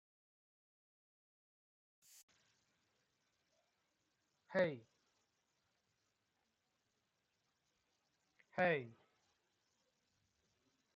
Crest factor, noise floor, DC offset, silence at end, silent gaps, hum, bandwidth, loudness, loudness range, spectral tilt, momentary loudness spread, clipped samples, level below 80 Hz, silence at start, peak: 26 dB; -86 dBFS; under 0.1%; 2.05 s; none; none; 7.4 kHz; -40 LUFS; 2 LU; -4 dB/octave; 17 LU; under 0.1%; under -90 dBFS; 4.5 s; -24 dBFS